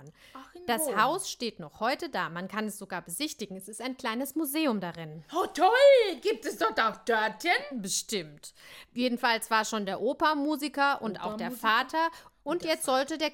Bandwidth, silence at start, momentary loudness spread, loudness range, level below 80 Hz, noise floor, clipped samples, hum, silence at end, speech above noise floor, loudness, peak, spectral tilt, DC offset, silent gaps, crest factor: 17 kHz; 0 s; 12 LU; 7 LU; -68 dBFS; -50 dBFS; under 0.1%; none; 0 s; 21 dB; -28 LUFS; -10 dBFS; -3 dB/octave; under 0.1%; none; 20 dB